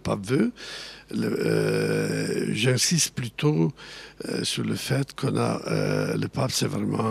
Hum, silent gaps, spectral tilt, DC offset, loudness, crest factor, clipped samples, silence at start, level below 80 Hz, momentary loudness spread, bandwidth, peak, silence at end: none; none; -4.5 dB/octave; under 0.1%; -25 LUFS; 16 dB; under 0.1%; 0.05 s; -58 dBFS; 11 LU; 15.5 kHz; -8 dBFS; 0 s